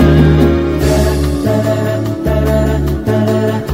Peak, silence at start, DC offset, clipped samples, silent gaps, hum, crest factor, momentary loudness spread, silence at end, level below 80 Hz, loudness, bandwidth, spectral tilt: -2 dBFS; 0 s; 0.4%; under 0.1%; none; none; 10 dB; 6 LU; 0 s; -18 dBFS; -13 LUFS; 16.5 kHz; -7.5 dB/octave